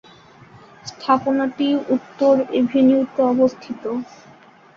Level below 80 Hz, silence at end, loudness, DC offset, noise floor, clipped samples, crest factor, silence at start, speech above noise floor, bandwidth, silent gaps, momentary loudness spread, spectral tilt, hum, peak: -62 dBFS; 0.7 s; -19 LUFS; under 0.1%; -47 dBFS; under 0.1%; 18 dB; 0.85 s; 29 dB; 7.2 kHz; none; 14 LU; -6 dB/octave; none; -2 dBFS